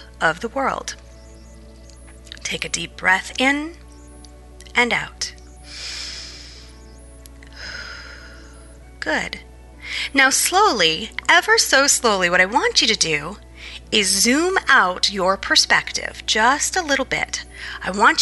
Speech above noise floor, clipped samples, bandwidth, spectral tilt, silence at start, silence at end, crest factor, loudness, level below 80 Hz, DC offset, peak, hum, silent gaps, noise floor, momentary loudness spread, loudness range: 23 dB; under 0.1%; 12 kHz; -1 dB/octave; 0 s; 0 s; 18 dB; -18 LUFS; -44 dBFS; under 0.1%; -2 dBFS; 60 Hz at -45 dBFS; none; -42 dBFS; 20 LU; 15 LU